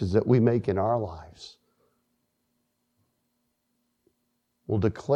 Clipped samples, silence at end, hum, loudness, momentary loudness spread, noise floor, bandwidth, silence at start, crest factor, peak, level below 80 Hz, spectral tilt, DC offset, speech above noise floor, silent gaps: under 0.1%; 0 s; none; -25 LUFS; 24 LU; -76 dBFS; 8.4 kHz; 0 s; 20 dB; -8 dBFS; -56 dBFS; -9 dB/octave; under 0.1%; 51 dB; none